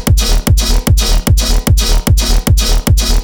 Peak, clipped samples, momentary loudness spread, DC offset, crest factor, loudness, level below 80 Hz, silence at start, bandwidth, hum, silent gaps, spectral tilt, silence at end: 0 dBFS; under 0.1%; 0 LU; 0.4%; 10 dB; -12 LUFS; -12 dBFS; 0 s; over 20 kHz; none; none; -4 dB/octave; 0 s